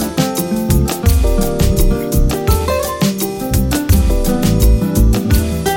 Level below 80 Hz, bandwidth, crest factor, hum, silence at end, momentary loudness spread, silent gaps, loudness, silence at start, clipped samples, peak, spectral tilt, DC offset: -16 dBFS; 17 kHz; 12 dB; none; 0 s; 3 LU; none; -15 LUFS; 0 s; under 0.1%; 0 dBFS; -5.5 dB/octave; under 0.1%